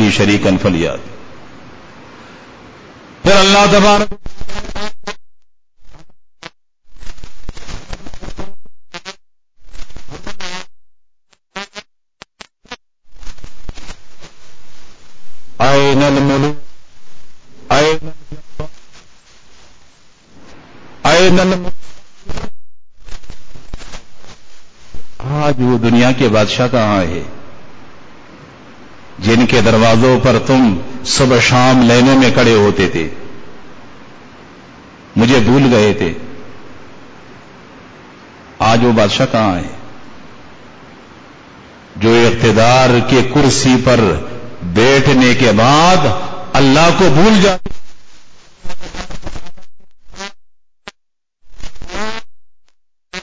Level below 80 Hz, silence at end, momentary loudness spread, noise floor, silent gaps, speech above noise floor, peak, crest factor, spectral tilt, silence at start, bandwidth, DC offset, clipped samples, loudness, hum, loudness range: -36 dBFS; 0 s; 24 LU; -66 dBFS; none; 56 dB; 0 dBFS; 14 dB; -5 dB/octave; 0 s; 8 kHz; under 0.1%; under 0.1%; -11 LUFS; none; 22 LU